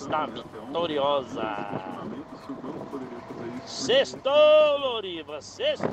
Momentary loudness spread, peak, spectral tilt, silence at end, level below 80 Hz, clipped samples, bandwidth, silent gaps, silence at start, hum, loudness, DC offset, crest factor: 19 LU; -10 dBFS; -4 dB/octave; 0 s; -64 dBFS; under 0.1%; 8.6 kHz; none; 0 s; none; -25 LUFS; under 0.1%; 16 dB